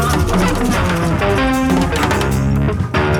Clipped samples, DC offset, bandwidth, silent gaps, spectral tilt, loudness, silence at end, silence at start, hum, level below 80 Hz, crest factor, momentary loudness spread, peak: under 0.1%; under 0.1%; 19 kHz; none; -6 dB/octave; -16 LUFS; 0 s; 0 s; none; -24 dBFS; 12 dB; 2 LU; -2 dBFS